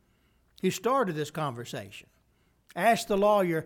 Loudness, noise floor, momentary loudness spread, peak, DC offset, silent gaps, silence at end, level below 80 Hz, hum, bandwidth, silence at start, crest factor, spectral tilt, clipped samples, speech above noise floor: -28 LUFS; -68 dBFS; 17 LU; -12 dBFS; under 0.1%; none; 0 s; -62 dBFS; none; 19 kHz; 0.65 s; 18 dB; -5 dB/octave; under 0.1%; 41 dB